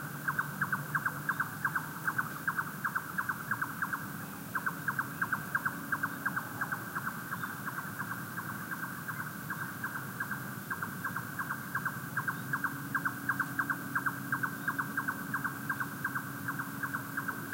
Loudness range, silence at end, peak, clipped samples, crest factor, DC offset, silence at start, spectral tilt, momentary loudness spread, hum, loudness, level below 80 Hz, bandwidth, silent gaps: 4 LU; 0 s; -18 dBFS; under 0.1%; 18 dB; under 0.1%; 0 s; -4.5 dB/octave; 5 LU; none; -36 LUFS; -70 dBFS; 16 kHz; none